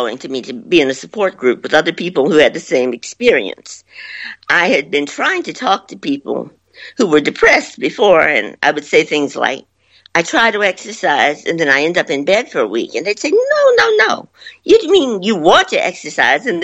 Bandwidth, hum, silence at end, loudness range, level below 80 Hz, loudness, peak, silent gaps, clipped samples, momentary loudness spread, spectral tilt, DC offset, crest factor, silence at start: 8.4 kHz; none; 0 s; 4 LU; -52 dBFS; -14 LUFS; 0 dBFS; none; under 0.1%; 13 LU; -3.5 dB/octave; under 0.1%; 14 dB; 0 s